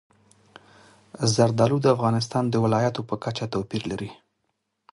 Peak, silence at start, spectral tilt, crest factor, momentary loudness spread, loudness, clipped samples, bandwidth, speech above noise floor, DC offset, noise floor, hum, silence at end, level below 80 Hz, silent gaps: -6 dBFS; 1.2 s; -6 dB/octave; 20 dB; 10 LU; -24 LUFS; under 0.1%; 11.5 kHz; 53 dB; under 0.1%; -76 dBFS; none; 0.8 s; -56 dBFS; none